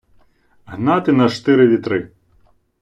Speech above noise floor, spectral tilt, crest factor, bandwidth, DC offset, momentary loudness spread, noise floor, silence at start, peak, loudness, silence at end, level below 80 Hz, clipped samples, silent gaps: 41 dB; -7.5 dB/octave; 16 dB; 9 kHz; under 0.1%; 15 LU; -55 dBFS; 0.7 s; -2 dBFS; -16 LUFS; 0.75 s; -56 dBFS; under 0.1%; none